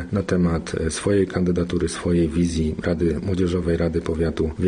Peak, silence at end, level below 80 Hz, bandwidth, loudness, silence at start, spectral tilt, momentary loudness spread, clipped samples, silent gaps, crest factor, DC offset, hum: -8 dBFS; 0 s; -36 dBFS; 10 kHz; -22 LUFS; 0 s; -6.5 dB/octave; 3 LU; under 0.1%; none; 14 dB; under 0.1%; none